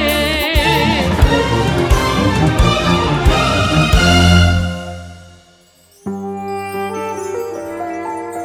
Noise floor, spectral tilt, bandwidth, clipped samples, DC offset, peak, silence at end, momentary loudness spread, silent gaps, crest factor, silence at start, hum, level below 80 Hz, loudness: -49 dBFS; -5 dB/octave; 18.5 kHz; under 0.1%; under 0.1%; 0 dBFS; 0 s; 14 LU; none; 14 dB; 0 s; none; -22 dBFS; -14 LUFS